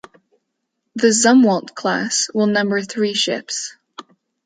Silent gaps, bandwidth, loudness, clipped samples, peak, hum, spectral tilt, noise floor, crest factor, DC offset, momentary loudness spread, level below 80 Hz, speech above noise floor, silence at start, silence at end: none; 9.6 kHz; -17 LUFS; under 0.1%; -2 dBFS; none; -3 dB/octave; -75 dBFS; 16 dB; under 0.1%; 13 LU; -68 dBFS; 58 dB; 0.95 s; 0.45 s